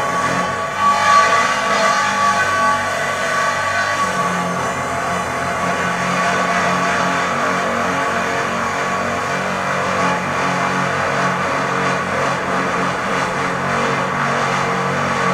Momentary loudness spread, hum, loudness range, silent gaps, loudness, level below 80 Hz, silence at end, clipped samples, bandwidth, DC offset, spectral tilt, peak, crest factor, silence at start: 4 LU; none; 3 LU; none; -17 LUFS; -50 dBFS; 0 s; under 0.1%; 16 kHz; under 0.1%; -3.5 dB/octave; -2 dBFS; 16 dB; 0 s